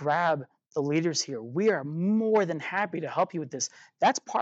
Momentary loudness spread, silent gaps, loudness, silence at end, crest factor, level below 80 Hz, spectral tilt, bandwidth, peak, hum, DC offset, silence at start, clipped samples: 7 LU; 0.66-0.71 s; -28 LUFS; 0 s; 16 dB; -86 dBFS; -4.5 dB/octave; 8.2 kHz; -12 dBFS; none; under 0.1%; 0 s; under 0.1%